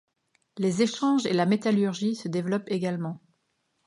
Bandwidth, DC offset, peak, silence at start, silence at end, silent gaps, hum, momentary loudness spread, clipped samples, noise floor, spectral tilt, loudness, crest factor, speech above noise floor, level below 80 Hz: 11.5 kHz; under 0.1%; -10 dBFS; 0.55 s; 0.7 s; none; none; 10 LU; under 0.1%; -75 dBFS; -6 dB/octave; -26 LUFS; 18 dB; 49 dB; -74 dBFS